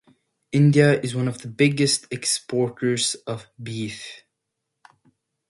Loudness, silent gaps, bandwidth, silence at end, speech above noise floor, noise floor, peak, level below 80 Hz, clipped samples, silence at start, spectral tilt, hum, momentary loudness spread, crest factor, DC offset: -22 LUFS; none; 11.5 kHz; 1.35 s; 59 dB; -80 dBFS; -4 dBFS; -64 dBFS; under 0.1%; 0.5 s; -5 dB/octave; none; 16 LU; 20 dB; under 0.1%